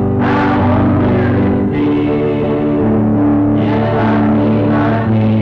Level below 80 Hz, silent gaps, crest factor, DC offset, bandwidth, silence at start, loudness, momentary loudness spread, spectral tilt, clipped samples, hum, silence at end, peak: -32 dBFS; none; 6 dB; under 0.1%; 5.6 kHz; 0 s; -13 LUFS; 2 LU; -10 dB/octave; under 0.1%; none; 0 s; -6 dBFS